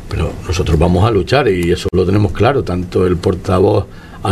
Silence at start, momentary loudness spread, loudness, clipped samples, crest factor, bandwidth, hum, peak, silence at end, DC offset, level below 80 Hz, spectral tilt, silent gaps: 0 s; 7 LU; -14 LUFS; under 0.1%; 14 dB; 13.5 kHz; none; 0 dBFS; 0 s; under 0.1%; -28 dBFS; -7 dB/octave; none